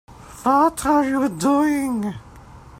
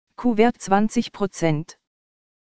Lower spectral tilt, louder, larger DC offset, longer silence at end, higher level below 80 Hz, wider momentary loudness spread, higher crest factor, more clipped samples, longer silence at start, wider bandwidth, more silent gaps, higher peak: about the same, -5.5 dB/octave vs -6 dB/octave; about the same, -20 LUFS vs -22 LUFS; neither; second, 0.1 s vs 0.65 s; about the same, -48 dBFS vs -50 dBFS; about the same, 9 LU vs 9 LU; about the same, 16 dB vs 20 dB; neither; about the same, 0.1 s vs 0.05 s; first, 15.5 kHz vs 9.4 kHz; neither; about the same, -4 dBFS vs -2 dBFS